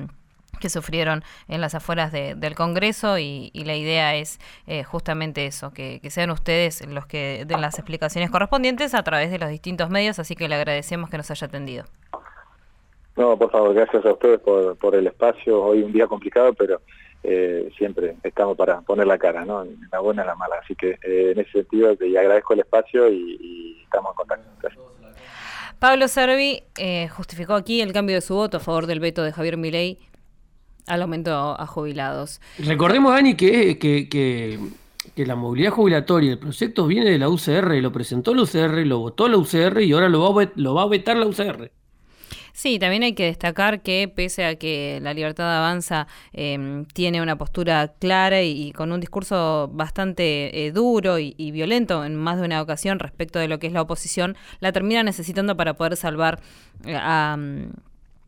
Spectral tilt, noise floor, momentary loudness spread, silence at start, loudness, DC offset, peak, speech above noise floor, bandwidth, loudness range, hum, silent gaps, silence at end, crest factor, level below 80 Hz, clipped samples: -5.5 dB/octave; -53 dBFS; 13 LU; 0 s; -21 LUFS; under 0.1%; -4 dBFS; 33 dB; 19 kHz; 6 LU; none; none; 0.55 s; 16 dB; -46 dBFS; under 0.1%